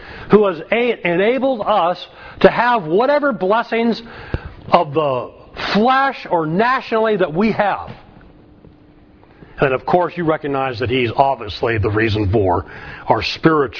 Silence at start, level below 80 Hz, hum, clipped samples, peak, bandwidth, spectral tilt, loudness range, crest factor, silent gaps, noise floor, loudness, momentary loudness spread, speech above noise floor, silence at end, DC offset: 0 s; -42 dBFS; none; under 0.1%; 0 dBFS; 5.4 kHz; -7.5 dB/octave; 4 LU; 18 dB; none; -46 dBFS; -17 LUFS; 11 LU; 30 dB; 0 s; under 0.1%